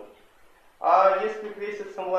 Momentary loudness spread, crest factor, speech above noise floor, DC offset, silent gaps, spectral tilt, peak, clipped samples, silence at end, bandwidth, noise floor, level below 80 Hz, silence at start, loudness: 15 LU; 20 dB; 32 dB; under 0.1%; none; -4.5 dB/octave; -6 dBFS; under 0.1%; 0 s; 7.8 kHz; -55 dBFS; -70 dBFS; 0 s; -24 LUFS